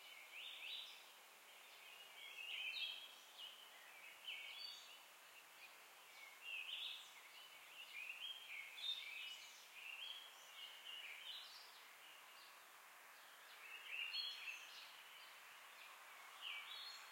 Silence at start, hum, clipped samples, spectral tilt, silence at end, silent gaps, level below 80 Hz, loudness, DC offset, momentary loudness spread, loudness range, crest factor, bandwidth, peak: 0 s; none; under 0.1%; 2.5 dB/octave; 0 s; none; under -90 dBFS; -52 LUFS; under 0.1%; 14 LU; 5 LU; 20 dB; 16.5 kHz; -34 dBFS